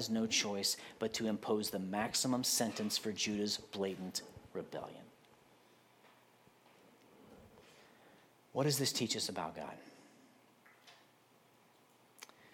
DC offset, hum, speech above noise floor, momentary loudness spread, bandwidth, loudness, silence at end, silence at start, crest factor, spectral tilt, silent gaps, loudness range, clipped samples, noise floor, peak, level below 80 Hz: under 0.1%; none; 30 dB; 17 LU; 17 kHz; -37 LUFS; 0.05 s; 0 s; 20 dB; -3 dB/octave; none; 17 LU; under 0.1%; -68 dBFS; -20 dBFS; -78 dBFS